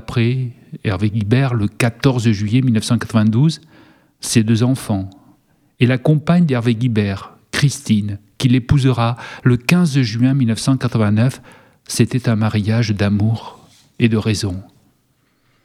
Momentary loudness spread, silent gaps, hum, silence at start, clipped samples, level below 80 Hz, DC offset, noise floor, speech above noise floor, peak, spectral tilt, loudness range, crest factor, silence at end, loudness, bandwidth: 9 LU; none; none; 0.1 s; under 0.1%; -46 dBFS; under 0.1%; -61 dBFS; 45 dB; 0 dBFS; -6.5 dB/octave; 2 LU; 16 dB; 1 s; -17 LUFS; 14 kHz